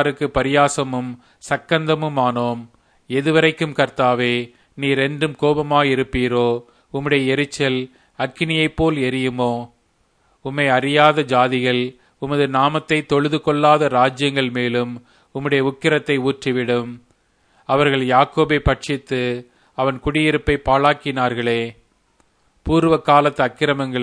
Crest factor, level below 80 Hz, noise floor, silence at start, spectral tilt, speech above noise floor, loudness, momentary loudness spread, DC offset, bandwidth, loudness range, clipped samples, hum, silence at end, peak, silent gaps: 18 dB; -40 dBFS; -62 dBFS; 0 s; -5.5 dB/octave; 44 dB; -18 LUFS; 12 LU; under 0.1%; 10.5 kHz; 3 LU; under 0.1%; none; 0 s; 0 dBFS; none